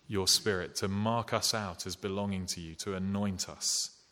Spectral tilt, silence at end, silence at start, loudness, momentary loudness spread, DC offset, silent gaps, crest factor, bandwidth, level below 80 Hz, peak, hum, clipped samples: -3 dB/octave; 0.2 s; 0.1 s; -32 LUFS; 11 LU; under 0.1%; none; 20 dB; 17.5 kHz; -62 dBFS; -12 dBFS; none; under 0.1%